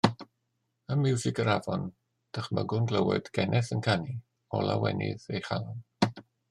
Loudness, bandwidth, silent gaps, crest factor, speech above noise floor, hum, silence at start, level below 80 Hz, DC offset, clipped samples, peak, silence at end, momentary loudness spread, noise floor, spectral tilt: -30 LUFS; 11 kHz; none; 24 dB; 50 dB; none; 0.05 s; -66 dBFS; under 0.1%; under 0.1%; -6 dBFS; 0.3 s; 12 LU; -79 dBFS; -6 dB/octave